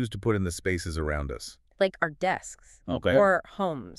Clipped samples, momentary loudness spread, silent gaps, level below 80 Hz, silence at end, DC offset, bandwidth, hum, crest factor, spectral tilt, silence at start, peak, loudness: under 0.1%; 16 LU; none; -44 dBFS; 0.05 s; under 0.1%; 13 kHz; none; 20 dB; -5.5 dB/octave; 0 s; -8 dBFS; -27 LUFS